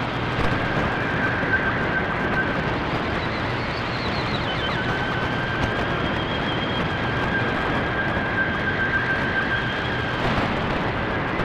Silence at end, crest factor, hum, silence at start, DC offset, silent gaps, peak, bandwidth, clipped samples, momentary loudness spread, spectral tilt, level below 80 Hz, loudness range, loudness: 0 s; 14 dB; none; 0 s; under 0.1%; none; -10 dBFS; 11.5 kHz; under 0.1%; 3 LU; -6 dB/octave; -38 dBFS; 1 LU; -23 LUFS